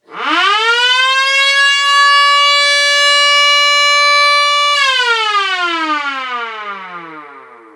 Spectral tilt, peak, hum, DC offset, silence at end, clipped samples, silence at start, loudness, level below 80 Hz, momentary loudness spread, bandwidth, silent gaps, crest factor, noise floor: 2 dB/octave; -2 dBFS; none; under 0.1%; 0.3 s; under 0.1%; 0.1 s; -9 LUFS; -88 dBFS; 13 LU; 15.5 kHz; none; 10 dB; -36 dBFS